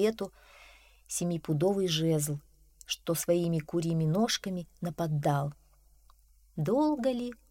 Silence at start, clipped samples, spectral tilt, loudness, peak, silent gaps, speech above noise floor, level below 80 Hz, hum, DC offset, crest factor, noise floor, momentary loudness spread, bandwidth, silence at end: 0 s; under 0.1%; -5.5 dB/octave; -31 LUFS; -16 dBFS; none; 31 dB; -60 dBFS; none; under 0.1%; 16 dB; -61 dBFS; 11 LU; 16.5 kHz; 0.15 s